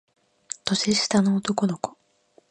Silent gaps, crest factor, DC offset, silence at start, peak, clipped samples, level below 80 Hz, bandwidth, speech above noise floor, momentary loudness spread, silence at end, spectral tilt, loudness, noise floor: none; 22 dB; under 0.1%; 0.65 s; -4 dBFS; under 0.1%; -62 dBFS; 10.5 kHz; 38 dB; 13 LU; 0.6 s; -4 dB/octave; -24 LUFS; -61 dBFS